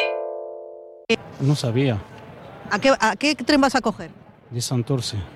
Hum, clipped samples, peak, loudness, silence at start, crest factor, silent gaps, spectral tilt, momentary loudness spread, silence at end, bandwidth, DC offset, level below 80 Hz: none; under 0.1%; -4 dBFS; -22 LUFS; 0 s; 18 dB; none; -5 dB/octave; 21 LU; 0 s; 13.5 kHz; under 0.1%; -52 dBFS